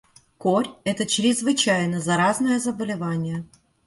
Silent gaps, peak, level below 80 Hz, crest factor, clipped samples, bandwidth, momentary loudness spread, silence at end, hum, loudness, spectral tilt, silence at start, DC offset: none; -8 dBFS; -60 dBFS; 16 dB; under 0.1%; 11.5 kHz; 8 LU; 0.4 s; none; -22 LUFS; -4 dB/octave; 0.4 s; under 0.1%